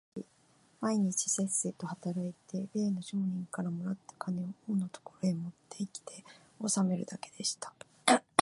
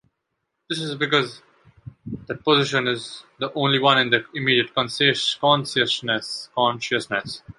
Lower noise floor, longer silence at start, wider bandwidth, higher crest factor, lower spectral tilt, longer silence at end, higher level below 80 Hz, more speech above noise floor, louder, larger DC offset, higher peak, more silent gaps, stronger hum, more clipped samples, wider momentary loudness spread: second, -67 dBFS vs -77 dBFS; second, 0.15 s vs 0.7 s; about the same, 11.5 kHz vs 11.5 kHz; first, 28 dB vs 20 dB; about the same, -4 dB/octave vs -4 dB/octave; about the same, 0 s vs 0.1 s; second, -80 dBFS vs -60 dBFS; second, 32 dB vs 55 dB; second, -34 LUFS vs -21 LUFS; neither; second, -6 dBFS vs -2 dBFS; neither; neither; neither; about the same, 13 LU vs 12 LU